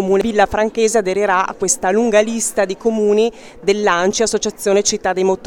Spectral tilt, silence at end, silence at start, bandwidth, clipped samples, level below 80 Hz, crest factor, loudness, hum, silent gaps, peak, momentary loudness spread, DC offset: -3 dB/octave; 0 s; 0 s; 18.5 kHz; under 0.1%; -46 dBFS; 16 dB; -16 LUFS; none; none; 0 dBFS; 3 LU; under 0.1%